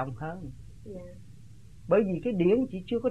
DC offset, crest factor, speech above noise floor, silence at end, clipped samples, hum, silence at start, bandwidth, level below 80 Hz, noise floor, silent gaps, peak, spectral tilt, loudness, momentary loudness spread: 0.3%; 18 dB; 23 dB; 0 s; under 0.1%; none; 0 s; 10.5 kHz; -54 dBFS; -51 dBFS; none; -12 dBFS; -9 dB/octave; -28 LUFS; 22 LU